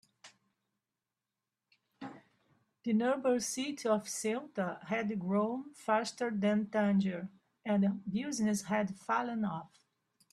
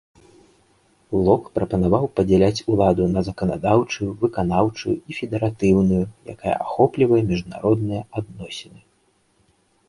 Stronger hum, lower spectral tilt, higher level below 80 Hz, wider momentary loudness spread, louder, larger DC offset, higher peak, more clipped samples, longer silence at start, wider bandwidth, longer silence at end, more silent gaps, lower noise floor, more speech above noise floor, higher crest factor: neither; second, -5 dB/octave vs -7.5 dB/octave; second, -76 dBFS vs -42 dBFS; about the same, 13 LU vs 11 LU; second, -34 LUFS vs -21 LUFS; neither; second, -18 dBFS vs -2 dBFS; neither; second, 0.25 s vs 1.1 s; first, 13.5 kHz vs 11.5 kHz; second, 0.65 s vs 1.25 s; neither; first, under -90 dBFS vs -63 dBFS; first, over 57 dB vs 43 dB; about the same, 18 dB vs 20 dB